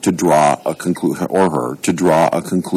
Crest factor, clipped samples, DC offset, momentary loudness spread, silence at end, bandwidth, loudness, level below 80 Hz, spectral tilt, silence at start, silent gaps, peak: 14 dB; under 0.1%; under 0.1%; 7 LU; 0 s; 15.5 kHz; -16 LUFS; -54 dBFS; -5.5 dB/octave; 0 s; none; -2 dBFS